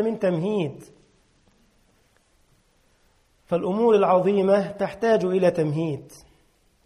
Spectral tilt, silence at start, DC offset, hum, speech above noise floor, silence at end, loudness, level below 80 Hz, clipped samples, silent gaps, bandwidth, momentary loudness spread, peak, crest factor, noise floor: -7.5 dB/octave; 0 s; under 0.1%; none; 41 dB; 0.7 s; -22 LUFS; -62 dBFS; under 0.1%; none; 12 kHz; 10 LU; -8 dBFS; 16 dB; -63 dBFS